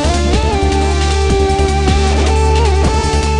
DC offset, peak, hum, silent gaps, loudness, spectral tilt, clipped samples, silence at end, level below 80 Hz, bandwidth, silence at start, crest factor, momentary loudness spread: under 0.1%; 0 dBFS; none; none; -13 LUFS; -5.5 dB/octave; under 0.1%; 0 s; -16 dBFS; 10.5 kHz; 0 s; 12 dB; 2 LU